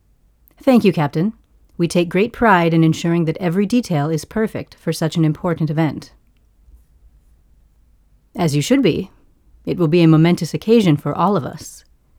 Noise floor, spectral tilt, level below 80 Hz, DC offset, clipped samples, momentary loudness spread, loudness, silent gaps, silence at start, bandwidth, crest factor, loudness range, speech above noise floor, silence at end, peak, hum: -55 dBFS; -6.5 dB/octave; -48 dBFS; under 0.1%; under 0.1%; 12 LU; -17 LUFS; none; 0.65 s; 15.5 kHz; 18 dB; 7 LU; 38 dB; 0.4 s; 0 dBFS; none